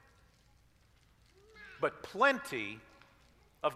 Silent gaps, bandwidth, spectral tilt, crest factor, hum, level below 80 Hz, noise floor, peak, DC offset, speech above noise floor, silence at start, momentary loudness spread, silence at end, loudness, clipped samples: none; 15.5 kHz; -4 dB/octave; 24 dB; none; -70 dBFS; -67 dBFS; -14 dBFS; under 0.1%; 33 dB; 1.55 s; 23 LU; 0 s; -34 LUFS; under 0.1%